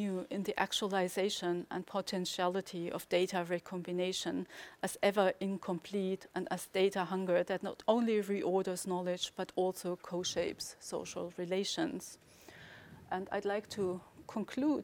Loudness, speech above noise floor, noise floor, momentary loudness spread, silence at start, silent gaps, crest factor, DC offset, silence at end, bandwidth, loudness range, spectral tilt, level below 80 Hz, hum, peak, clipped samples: -36 LUFS; 20 dB; -55 dBFS; 10 LU; 0 s; none; 22 dB; under 0.1%; 0 s; 18.5 kHz; 5 LU; -4.5 dB/octave; -74 dBFS; none; -14 dBFS; under 0.1%